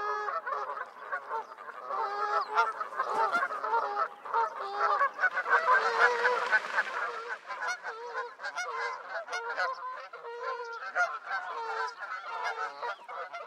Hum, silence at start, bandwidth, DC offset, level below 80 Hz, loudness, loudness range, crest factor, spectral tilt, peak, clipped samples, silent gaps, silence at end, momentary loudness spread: none; 0 s; 14.5 kHz; under 0.1%; under -90 dBFS; -31 LUFS; 8 LU; 22 dB; -0.5 dB/octave; -10 dBFS; under 0.1%; none; 0 s; 13 LU